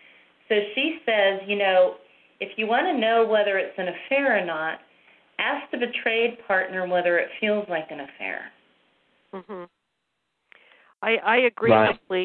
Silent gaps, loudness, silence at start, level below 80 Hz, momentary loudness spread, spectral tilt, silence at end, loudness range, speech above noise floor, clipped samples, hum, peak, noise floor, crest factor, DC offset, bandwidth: none; -23 LUFS; 0.5 s; -68 dBFS; 18 LU; -8 dB/octave; 0 s; 9 LU; 54 dB; under 0.1%; none; -4 dBFS; -77 dBFS; 20 dB; under 0.1%; 4.4 kHz